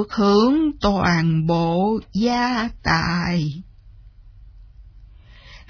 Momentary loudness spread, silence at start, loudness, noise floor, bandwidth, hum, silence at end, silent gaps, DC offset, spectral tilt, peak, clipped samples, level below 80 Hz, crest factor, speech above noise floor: 7 LU; 0 s; -19 LUFS; -45 dBFS; 5.4 kHz; none; 0.1 s; none; under 0.1%; -6.5 dB/octave; -4 dBFS; under 0.1%; -40 dBFS; 18 dB; 26 dB